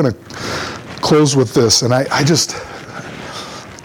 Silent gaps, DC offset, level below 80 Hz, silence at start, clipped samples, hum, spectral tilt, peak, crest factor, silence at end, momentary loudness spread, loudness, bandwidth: none; under 0.1%; -46 dBFS; 0 s; under 0.1%; none; -4 dB/octave; -2 dBFS; 14 dB; 0 s; 18 LU; -14 LUFS; 19 kHz